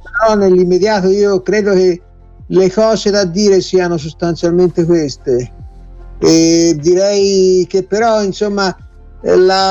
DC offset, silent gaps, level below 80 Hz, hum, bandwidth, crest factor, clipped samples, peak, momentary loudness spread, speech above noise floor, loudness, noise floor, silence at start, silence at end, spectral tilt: under 0.1%; none; -38 dBFS; none; 8 kHz; 12 dB; under 0.1%; 0 dBFS; 7 LU; 21 dB; -12 LUFS; -32 dBFS; 0 s; 0 s; -5 dB/octave